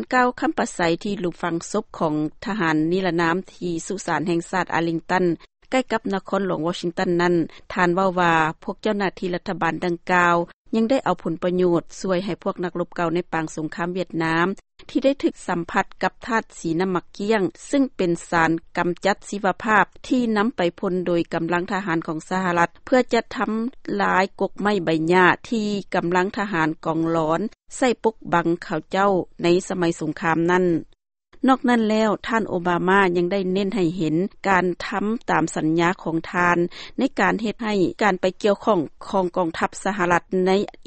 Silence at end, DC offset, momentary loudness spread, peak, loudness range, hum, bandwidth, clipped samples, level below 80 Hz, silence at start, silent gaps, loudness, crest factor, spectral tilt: 0.05 s; under 0.1%; 7 LU; -2 dBFS; 3 LU; none; 8.8 kHz; under 0.1%; -52 dBFS; 0 s; 10.54-10.65 s; -22 LUFS; 20 dB; -5.5 dB/octave